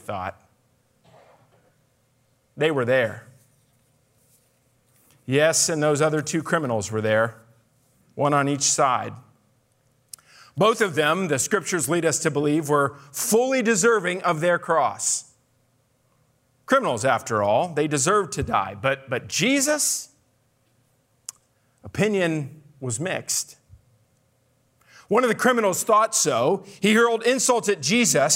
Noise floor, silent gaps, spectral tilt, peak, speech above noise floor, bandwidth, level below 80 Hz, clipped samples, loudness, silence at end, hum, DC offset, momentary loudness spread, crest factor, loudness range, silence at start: -65 dBFS; none; -3.5 dB/octave; -6 dBFS; 44 dB; 16 kHz; -60 dBFS; under 0.1%; -22 LUFS; 0 s; none; under 0.1%; 12 LU; 18 dB; 7 LU; 0.1 s